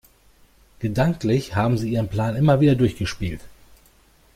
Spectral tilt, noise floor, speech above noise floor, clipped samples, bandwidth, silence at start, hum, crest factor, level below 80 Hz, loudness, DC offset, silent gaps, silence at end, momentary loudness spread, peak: -7.5 dB/octave; -55 dBFS; 35 dB; under 0.1%; 15.5 kHz; 0.8 s; none; 18 dB; -44 dBFS; -21 LUFS; under 0.1%; none; 0.85 s; 13 LU; -6 dBFS